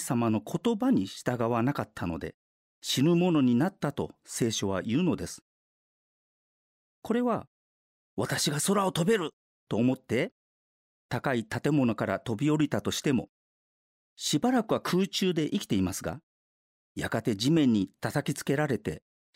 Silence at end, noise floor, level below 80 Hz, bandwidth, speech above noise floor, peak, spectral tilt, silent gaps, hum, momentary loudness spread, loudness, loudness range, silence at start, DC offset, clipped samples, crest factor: 0.4 s; under -90 dBFS; -62 dBFS; 16 kHz; over 62 dB; -12 dBFS; -5 dB/octave; 2.34-2.82 s, 5.42-7.02 s, 7.47-8.17 s, 9.33-9.67 s, 10.32-11.09 s, 13.29-14.17 s, 16.23-16.95 s; none; 12 LU; -29 LUFS; 5 LU; 0 s; under 0.1%; under 0.1%; 16 dB